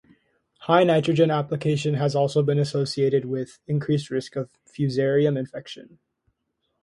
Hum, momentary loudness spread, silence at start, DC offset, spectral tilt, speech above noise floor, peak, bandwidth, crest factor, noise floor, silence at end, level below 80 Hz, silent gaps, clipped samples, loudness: none; 14 LU; 0.6 s; under 0.1%; -7 dB/octave; 53 dB; -4 dBFS; 11.5 kHz; 20 dB; -76 dBFS; 1 s; -64 dBFS; none; under 0.1%; -23 LUFS